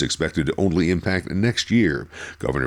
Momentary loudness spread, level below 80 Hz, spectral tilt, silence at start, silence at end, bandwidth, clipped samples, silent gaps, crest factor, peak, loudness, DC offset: 9 LU; -40 dBFS; -5.5 dB/octave; 0 s; 0 s; 13 kHz; under 0.1%; none; 14 dB; -6 dBFS; -22 LUFS; under 0.1%